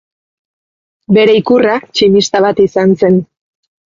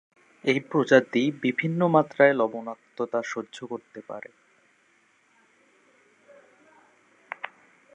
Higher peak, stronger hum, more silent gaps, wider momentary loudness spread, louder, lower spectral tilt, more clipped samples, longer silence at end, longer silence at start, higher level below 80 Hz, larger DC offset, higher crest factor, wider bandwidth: first, 0 dBFS vs -4 dBFS; neither; neither; second, 4 LU vs 20 LU; first, -10 LUFS vs -24 LUFS; about the same, -5.5 dB/octave vs -6.5 dB/octave; neither; first, 0.65 s vs 0.5 s; first, 1.1 s vs 0.45 s; first, -50 dBFS vs -82 dBFS; neither; second, 12 dB vs 24 dB; second, 7.6 kHz vs 9.4 kHz